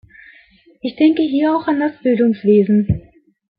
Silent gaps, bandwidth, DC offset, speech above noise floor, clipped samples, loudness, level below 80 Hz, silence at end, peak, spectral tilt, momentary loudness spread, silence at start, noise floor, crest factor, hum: none; 5 kHz; under 0.1%; 35 dB; under 0.1%; -16 LUFS; -44 dBFS; 0.6 s; -2 dBFS; -12 dB/octave; 10 LU; 0.85 s; -50 dBFS; 14 dB; none